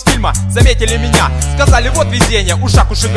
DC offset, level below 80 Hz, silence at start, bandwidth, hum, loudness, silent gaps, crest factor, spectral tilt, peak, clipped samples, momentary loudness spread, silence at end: under 0.1%; -14 dBFS; 0 s; 11 kHz; none; -11 LUFS; none; 10 dB; -4.5 dB/octave; 0 dBFS; 0.3%; 3 LU; 0 s